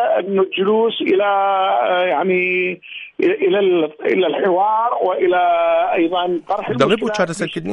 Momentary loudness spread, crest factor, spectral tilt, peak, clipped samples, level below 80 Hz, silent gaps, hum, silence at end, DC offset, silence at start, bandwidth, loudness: 5 LU; 14 dB; -5.5 dB/octave; -2 dBFS; under 0.1%; -62 dBFS; none; none; 0 s; under 0.1%; 0 s; 11 kHz; -17 LUFS